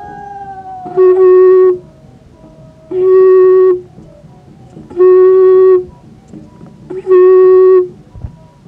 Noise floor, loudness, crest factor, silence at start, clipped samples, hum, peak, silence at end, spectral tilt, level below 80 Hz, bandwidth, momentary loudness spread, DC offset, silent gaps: -39 dBFS; -7 LUFS; 10 dB; 0 s; under 0.1%; none; 0 dBFS; 0.4 s; -9.5 dB/octave; -44 dBFS; 2.8 kHz; 21 LU; under 0.1%; none